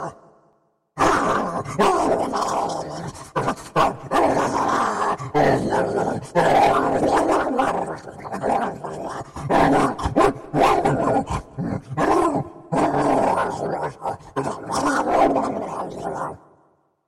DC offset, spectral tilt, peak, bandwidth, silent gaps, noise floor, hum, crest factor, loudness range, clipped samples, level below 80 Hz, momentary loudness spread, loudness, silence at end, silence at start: under 0.1%; -5.5 dB/octave; -4 dBFS; 16 kHz; none; -63 dBFS; none; 18 dB; 3 LU; under 0.1%; -44 dBFS; 11 LU; -21 LUFS; 0.7 s; 0 s